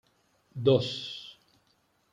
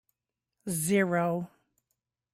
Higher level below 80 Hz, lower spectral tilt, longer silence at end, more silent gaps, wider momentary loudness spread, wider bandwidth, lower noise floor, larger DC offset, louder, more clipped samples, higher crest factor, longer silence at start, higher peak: about the same, -72 dBFS vs -72 dBFS; about the same, -6.5 dB/octave vs -5.5 dB/octave; about the same, 0.8 s vs 0.9 s; neither; first, 21 LU vs 17 LU; second, 9.4 kHz vs 16 kHz; second, -70 dBFS vs -88 dBFS; neither; about the same, -28 LUFS vs -29 LUFS; neither; about the same, 20 dB vs 18 dB; about the same, 0.55 s vs 0.65 s; first, -10 dBFS vs -14 dBFS